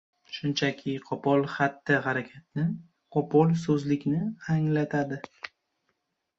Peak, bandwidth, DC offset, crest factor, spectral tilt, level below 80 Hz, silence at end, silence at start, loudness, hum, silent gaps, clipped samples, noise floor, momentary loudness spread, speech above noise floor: -8 dBFS; 7.8 kHz; under 0.1%; 20 dB; -7 dB/octave; -66 dBFS; 0.9 s; 0.3 s; -28 LUFS; none; none; under 0.1%; -78 dBFS; 14 LU; 51 dB